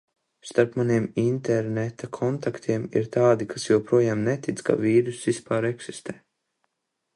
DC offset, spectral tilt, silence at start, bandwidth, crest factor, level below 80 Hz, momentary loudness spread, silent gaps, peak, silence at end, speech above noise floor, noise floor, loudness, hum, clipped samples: under 0.1%; -6.5 dB/octave; 0.45 s; 11.5 kHz; 20 dB; -64 dBFS; 9 LU; none; -4 dBFS; 1 s; 56 dB; -80 dBFS; -24 LUFS; none; under 0.1%